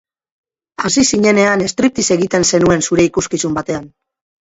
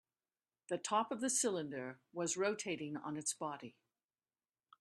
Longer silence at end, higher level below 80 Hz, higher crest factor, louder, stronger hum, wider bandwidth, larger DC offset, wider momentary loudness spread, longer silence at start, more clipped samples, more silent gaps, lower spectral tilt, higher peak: second, 0.55 s vs 1.1 s; first, -46 dBFS vs -86 dBFS; second, 14 dB vs 20 dB; first, -14 LUFS vs -39 LUFS; neither; second, 8 kHz vs 13.5 kHz; neither; about the same, 9 LU vs 11 LU; about the same, 0.8 s vs 0.7 s; neither; neither; about the same, -4 dB/octave vs -3 dB/octave; first, 0 dBFS vs -22 dBFS